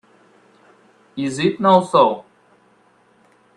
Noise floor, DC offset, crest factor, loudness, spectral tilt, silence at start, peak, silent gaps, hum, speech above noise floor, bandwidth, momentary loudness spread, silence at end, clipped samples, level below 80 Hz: -56 dBFS; under 0.1%; 20 dB; -17 LUFS; -6 dB/octave; 1.15 s; 0 dBFS; none; none; 40 dB; 11 kHz; 17 LU; 1.35 s; under 0.1%; -64 dBFS